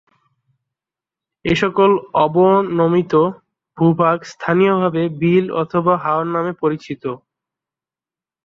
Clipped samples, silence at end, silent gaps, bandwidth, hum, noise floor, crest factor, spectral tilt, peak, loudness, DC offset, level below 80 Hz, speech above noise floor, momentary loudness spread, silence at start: under 0.1%; 1.3 s; none; 7.6 kHz; none; under -90 dBFS; 16 dB; -7.5 dB/octave; -2 dBFS; -17 LUFS; under 0.1%; -54 dBFS; over 74 dB; 9 LU; 1.45 s